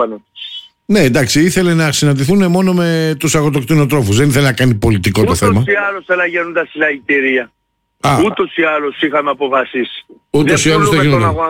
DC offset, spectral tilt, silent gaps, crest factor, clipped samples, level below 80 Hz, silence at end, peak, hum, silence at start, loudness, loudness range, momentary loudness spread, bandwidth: under 0.1%; -5 dB/octave; none; 10 dB; under 0.1%; -38 dBFS; 0 s; -2 dBFS; none; 0 s; -13 LUFS; 3 LU; 8 LU; 17 kHz